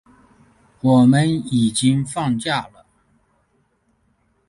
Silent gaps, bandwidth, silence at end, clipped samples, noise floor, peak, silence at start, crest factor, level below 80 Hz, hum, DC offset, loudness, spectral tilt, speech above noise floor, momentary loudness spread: none; 11.5 kHz; 1.85 s; under 0.1%; -64 dBFS; -4 dBFS; 0.85 s; 16 dB; -54 dBFS; none; under 0.1%; -18 LUFS; -5.5 dB/octave; 47 dB; 10 LU